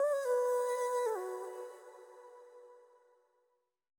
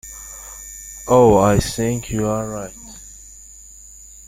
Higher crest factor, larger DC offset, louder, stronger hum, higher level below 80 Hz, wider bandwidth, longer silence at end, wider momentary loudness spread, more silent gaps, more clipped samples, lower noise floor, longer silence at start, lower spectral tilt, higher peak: about the same, 14 dB vs 18 dB; neither; second, -35 LUFS vs -17 LUFS; neither; second, under -90 dBFS vs -38 dBFS; first, 19.5 kHz vs 16 kHz; about the same, 1.2 s vs 1.1 s; about the same, 24 LU vs 26 LU; neither; neither; first, -80 dBFS vs -42 dBFS; about the same, 0 s vs 0.05 s; second, 0.5 dB/octave vs -5.5 dB/octave; second, -24 dBFS vs -2 dBFS